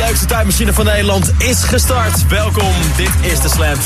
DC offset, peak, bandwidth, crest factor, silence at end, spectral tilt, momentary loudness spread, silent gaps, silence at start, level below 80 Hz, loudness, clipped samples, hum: 0.2%; 0 dBFS; 15 kHz; 12 dB; 0 s; -4 dB/octave; 1 LU; none; 0 s; -16 dBFS; -13 LUFS; under 0.1%; none